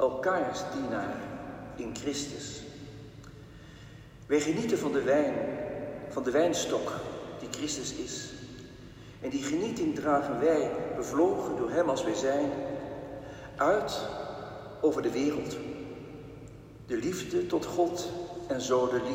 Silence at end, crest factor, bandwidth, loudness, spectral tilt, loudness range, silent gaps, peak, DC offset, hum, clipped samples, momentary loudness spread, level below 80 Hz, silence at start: 0 s; 18 dB; 16 kHz; -31 LUFS; -4.5 dB/octave; 6 LU; none; -14 dBFS; under 0.1%; none; under 0.1%; 19 LU; -58 dBFS; 0 s